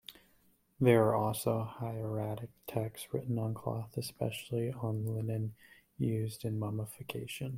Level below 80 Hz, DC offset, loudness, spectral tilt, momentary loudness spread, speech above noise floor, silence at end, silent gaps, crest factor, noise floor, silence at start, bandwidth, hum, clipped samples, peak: -66 dBFS; under 0.1%; -35 LUFS; -6.5 dB/octave; 12 LU; 35 dB; 0 s; none; 22 dB; -69 dBFS; 0.1 s; 16.5 kHz; none; under 0.1%; -12 dBFS